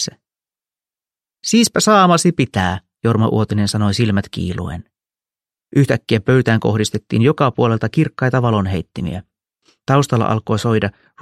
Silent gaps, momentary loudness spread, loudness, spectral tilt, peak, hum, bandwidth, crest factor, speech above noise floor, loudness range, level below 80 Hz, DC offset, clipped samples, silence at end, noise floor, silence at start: none; 12 LU; -16 LUFS; -5.5 dB/octave; 0 dBFS; none; 14 kHz; 16 dB; over 74 dB; 4 LU; -46 dBFS; under 0.1%; under 0.1%; 0.3 s; under -90 dBFS; 0 s